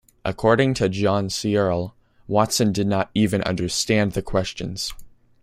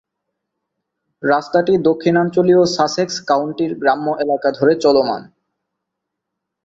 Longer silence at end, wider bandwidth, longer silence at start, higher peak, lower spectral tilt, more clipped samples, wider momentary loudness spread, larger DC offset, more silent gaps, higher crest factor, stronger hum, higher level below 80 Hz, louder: second, 0.35 s vs 1.45 s; first, 16 kHz vs 7.8 kHz; second, 0.25 s vs 1.2 s; about the same, -2 dBFS vs -2 dBFS; about the same, -5 dB/octave vs -5.5 dB/octave; neither; about the same, 9 LU vs 7 LU; neither; neither; about the same, 20 dB vs 16 dB; neither; first, -46 dBFS vs -58 dBFS; second, -22 LUFS vs -16 LUFS